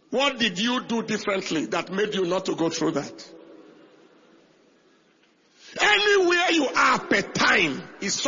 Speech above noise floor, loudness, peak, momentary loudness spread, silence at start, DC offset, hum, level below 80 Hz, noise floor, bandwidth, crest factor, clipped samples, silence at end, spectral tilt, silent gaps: 36 dB; -22 LUFS; -4 dBFS; 9 LU; 0.1 s; under 0.1%; none; -64 dBFS; -61 dBFS; 7.6 kHz; 20 dB; under 0.1%; 0 s; -3 dB/octave; none